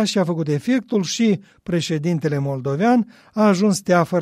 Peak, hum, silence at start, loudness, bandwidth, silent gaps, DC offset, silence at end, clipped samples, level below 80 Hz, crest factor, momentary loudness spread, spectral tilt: -4 dBFS; none; 0 s; -20 LUFS; 14.5 kHz; none; under 0.1%; 0 s; under 0.1%; -60 dBFS; 16 dB; 7 LU; -6 dB/octave